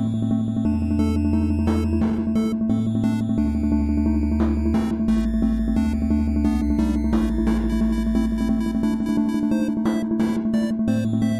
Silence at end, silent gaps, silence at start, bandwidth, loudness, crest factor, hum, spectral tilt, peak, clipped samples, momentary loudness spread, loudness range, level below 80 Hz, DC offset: 0 s; none; 0 s; 12.5 kHz; -22 LUFS; 12 dB; none; -8 dB/octave; -8 dBFS; under 0.1%; 1 LU; 1 LU; -28 dBFS; under 0.1%